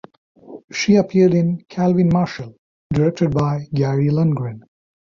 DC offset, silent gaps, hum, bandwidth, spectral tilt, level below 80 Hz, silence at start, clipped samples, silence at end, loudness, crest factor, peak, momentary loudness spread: under 0.1%; 0.64-0.68 s, 2.58-2.90 s; none; 7.4 kHz; -7.5 dB/octave; -48 dBFS; 0.5 s; under 0.1%; 0.45 s; -18 LUFS; 14 dB; -4 dBFS; 10 LU